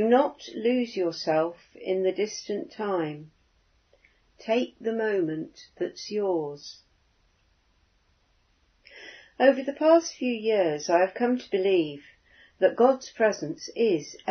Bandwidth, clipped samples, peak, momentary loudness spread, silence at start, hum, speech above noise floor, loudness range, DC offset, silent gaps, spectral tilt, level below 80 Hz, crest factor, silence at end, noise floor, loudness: 6.6 kHz; under 0.1%; -6 dBFS; 15 LU; 0 s; none; 41 dB; 10 LU; under 0.1%; none; -4.5 dB/octave; -70 dBFS; 20 dB; 0 s; -67 dBFS; -26 LUFS